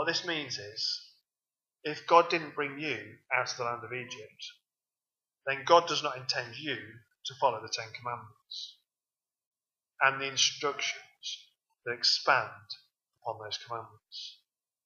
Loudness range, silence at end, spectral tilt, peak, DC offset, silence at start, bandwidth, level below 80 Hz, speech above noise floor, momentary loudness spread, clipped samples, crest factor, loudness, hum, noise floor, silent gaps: 6 LU; 0.5 s; -2 dB/octave; -8 dBFS; under 0.1%; 0 s; 7.4 kHz; -88 dBFS; over 58 dB; 19 LU; under 0.1%; 26 dB; -31 LUFS; none; under -90 dBFS; 9.46-9.52 s